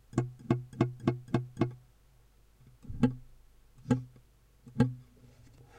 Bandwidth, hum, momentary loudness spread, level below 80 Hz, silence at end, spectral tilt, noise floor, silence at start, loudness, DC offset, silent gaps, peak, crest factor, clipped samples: 9.6 kHz; none; 18 LU; -54 dBFS; 0.75 s; -8.5 dB/octave; -62 dBFS; 0.15 s; -33 LUFS; under 0.1%; none; -12 dBFS; 24 dB; under 0.1%